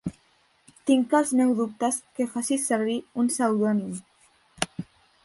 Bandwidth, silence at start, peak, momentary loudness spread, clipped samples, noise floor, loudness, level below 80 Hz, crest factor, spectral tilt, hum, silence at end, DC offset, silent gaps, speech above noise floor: 12 kHz; 0.05 s; -6 dBFS; 15 LU; under 0.1%; -64 dBFS; -25 LUFS; -64 dBFS; 20 dB; -4.5 dB/octave; none; 0.4 s; under 0.1%; none; 40 dB